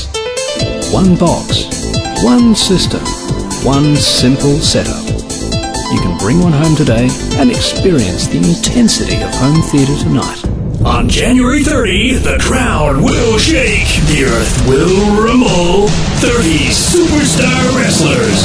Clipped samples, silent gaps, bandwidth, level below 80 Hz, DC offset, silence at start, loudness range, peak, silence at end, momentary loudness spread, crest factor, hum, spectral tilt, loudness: under 0.1%; none; 11 kHz; -20 dBFS; under 0.1%; 0 s; 2 LU; 0 dBFS; 0 s; 7 LU; 10 dB; none; -4.5 dB/octave; -11 LUFS